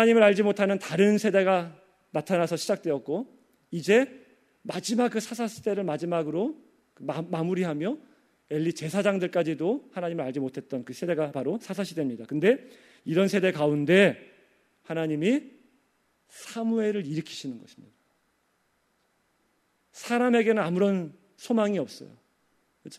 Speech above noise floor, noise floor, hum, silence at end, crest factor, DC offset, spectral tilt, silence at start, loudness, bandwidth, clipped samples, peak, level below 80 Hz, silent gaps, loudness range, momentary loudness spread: 46 dB; -71 dBFS; none; 0 s; 22 dB; under 0.1%; -6 dB/octave; 0 s; -27 LUFS; 14.5 kHz; under 0.1%; -6 dBFS; -76 dBFS; none; 7 LU; 15 LU